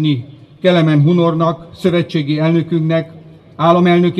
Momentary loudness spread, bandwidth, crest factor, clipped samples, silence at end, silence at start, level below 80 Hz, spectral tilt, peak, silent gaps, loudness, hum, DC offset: 8 LU; 8.2 kHz; 14 dB; under 0.1%; 0 s; 0 s; -54 dBFS; -8.5 dB/octave; 0 dBFS; none; -14 LUFS; none; under 0.1%